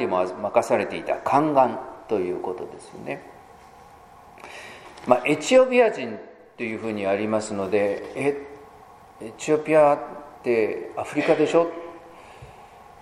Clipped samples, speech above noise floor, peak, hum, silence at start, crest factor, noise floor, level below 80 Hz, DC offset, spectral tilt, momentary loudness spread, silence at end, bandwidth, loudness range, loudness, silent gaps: under 0.1%; 26 dB; -2 dBFS; none; 0 s; 22 dB; -48 dBFS; -62 dBFS; under 0.1%; -5 dB/octave; 21 LU; 0.2 s; 12.5 kHz; 6 LU; -23 LUFS; none